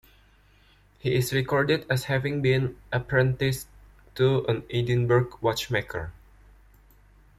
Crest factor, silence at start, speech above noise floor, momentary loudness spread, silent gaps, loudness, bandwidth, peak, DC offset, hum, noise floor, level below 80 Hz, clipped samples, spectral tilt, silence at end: 18 dB; 1.05 s; 33 dB; 11 LU; none; -26 LUFS; 15 kHz; -10 dBFS; under 0.1%; 50 Hz at -60 dBFS; -58 dBFS; -50 dBFS; under 0.1%; -6 dB/octave; 1.25 s